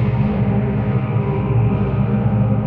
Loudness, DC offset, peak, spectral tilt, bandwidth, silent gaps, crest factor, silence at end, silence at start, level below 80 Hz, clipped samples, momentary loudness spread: -18 LUFS; under 0.1%; -6 dBFS; -12 dB/octave; 3.9 kHz; none; 12 dB; 0 s; 0 s; -30 dBFS; under 0.1%; 2 LU